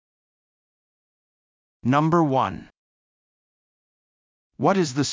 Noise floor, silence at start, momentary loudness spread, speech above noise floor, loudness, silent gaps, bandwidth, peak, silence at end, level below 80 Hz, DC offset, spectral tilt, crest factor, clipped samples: under -90 dBFS; 1.85 s; 10 LU; over 69 dB; -22 LUFS; 2.77-4.50 s; 7.6 kHz; -6 dBFS; 0 s; -60 dBFS; under 0.1%; -6 dB/octave; 20 dB; under 0.1%